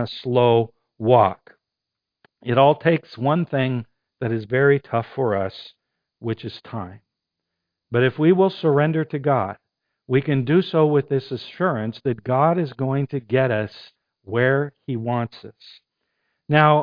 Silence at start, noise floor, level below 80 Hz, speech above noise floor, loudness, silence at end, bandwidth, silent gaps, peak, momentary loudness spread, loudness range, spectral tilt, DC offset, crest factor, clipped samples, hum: 0 s; -84 dBFS; -60 dBFS; 64 dB; -21 LUFS; 0 s; 5.2 kHz; none; 0 dBFS; 14 LU; 4 LU; -9.5 dB/octave; under 0.1%; 20 dB; under 0.1%; none